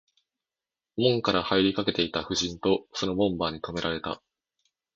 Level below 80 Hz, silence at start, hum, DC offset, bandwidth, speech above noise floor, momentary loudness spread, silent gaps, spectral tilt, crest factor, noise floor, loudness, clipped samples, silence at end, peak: -54 dBFS; 0.95 s; none; under 0.1%; 7.8 kHz; over 63 dB; 9 LU; none; -4.5 dB/octave; 20 dB; under -90 dBFS; -27 LUFS; under 0.1%; 0.8 s; -8 dBFS